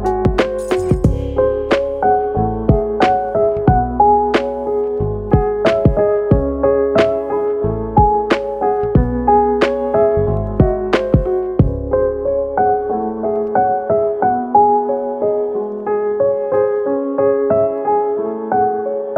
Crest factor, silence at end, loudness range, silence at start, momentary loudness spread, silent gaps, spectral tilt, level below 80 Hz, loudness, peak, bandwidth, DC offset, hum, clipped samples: 14 dB; 0 s; 2 LU; 0 s; 5 LU; none; -8 dB/octave; -28 dBFS; -16 LUFS; 0 dBFS; 9.6 kHz; under 0.1%; none; under 0.1%